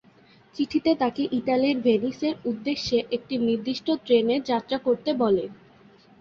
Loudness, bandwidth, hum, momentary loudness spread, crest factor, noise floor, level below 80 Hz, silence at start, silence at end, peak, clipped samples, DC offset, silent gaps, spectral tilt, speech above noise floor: -25 LUFS; 7.2 kHz; none; 6 LU; 16 dB; -55 dBFS; -60 dBFS; 0.55 s; 0.65 s; -10 dBFS; under 0.1%; under 0.1%; none; -6 dB/octave; 31 dB